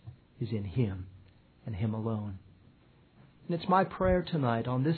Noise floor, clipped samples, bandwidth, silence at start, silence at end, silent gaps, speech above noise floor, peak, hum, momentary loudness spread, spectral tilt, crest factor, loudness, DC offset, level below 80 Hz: -61 dBFS; under 0.1%; 4.6 kHz; 0.05 s; 0 s; none; 31 dB; -12 dBFS; none; 20 LU; -11 dB/octave; 20 dB; -32 LUFS; under 0.1%; -50 dBFS